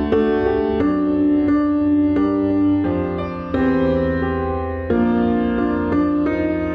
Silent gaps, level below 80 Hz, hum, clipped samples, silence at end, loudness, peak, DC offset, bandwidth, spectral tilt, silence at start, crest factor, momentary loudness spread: none; -36 dBFS; none; under 0.1%; 0 s; -18 LUFS; -6 dBFS; under 0.1%; 5.2 kHz; -10 dB/octave; 0 s; 12 dB; 5 LU